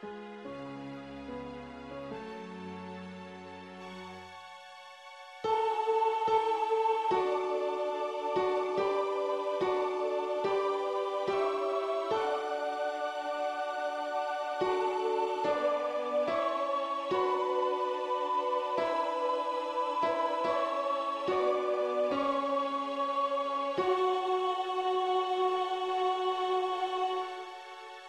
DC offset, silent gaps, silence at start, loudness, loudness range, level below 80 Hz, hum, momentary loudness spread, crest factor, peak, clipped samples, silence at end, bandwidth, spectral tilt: under 0.1%; none; 0 s; -31 LUFS; 12 LU; -72 dBFS; none; 15 LU; 16 dB; -16 dBFS; under 0.1%; 0 s; 11 kHz; -4.5 dB/octave